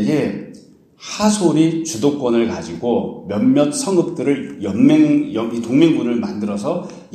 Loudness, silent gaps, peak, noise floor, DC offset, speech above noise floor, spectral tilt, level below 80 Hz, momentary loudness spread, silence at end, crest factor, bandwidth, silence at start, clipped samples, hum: -17 LUFS; none; 0 dBFS; -44 dBFS; under 0.1%; 28 dB; -5.5 dB/octave; -56 dBFS; 10 LU; 0.15 s; 16 dB; 13.5 kHz; 0 s; under 0.1%; none